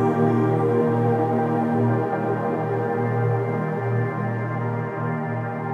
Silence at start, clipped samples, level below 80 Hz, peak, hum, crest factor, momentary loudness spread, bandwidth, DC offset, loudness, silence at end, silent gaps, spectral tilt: 0 s; under 0.1%; -70 dBFS; -10 dBFS; none; 12 dB; 6 LU; 4.4 kHz; under 0.1%; -23 LUFS; 0 s; none; -10 dB/octave